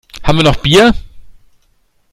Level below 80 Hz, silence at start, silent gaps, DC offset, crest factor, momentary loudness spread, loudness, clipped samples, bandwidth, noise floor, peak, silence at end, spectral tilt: -28 dBFS; 0.15 s; none; under 0.1%; 12 dB; 8 LU; -10 LUFS; under 0.1%; 16 kHz; -56 dBFS; 0 dBFS; 0.8 s; -5 dB/octave